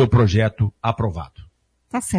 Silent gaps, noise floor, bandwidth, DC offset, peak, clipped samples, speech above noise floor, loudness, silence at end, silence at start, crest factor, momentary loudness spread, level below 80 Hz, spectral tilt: none; -51 dBFS; 11 kHz; under 0.1%; -4 dBFS; under 0.1%; 32 dB; -20 LUFS; 0 s; 0 s; 16 dB; 16 LU; -38 dBFS; -6.5 dB/octave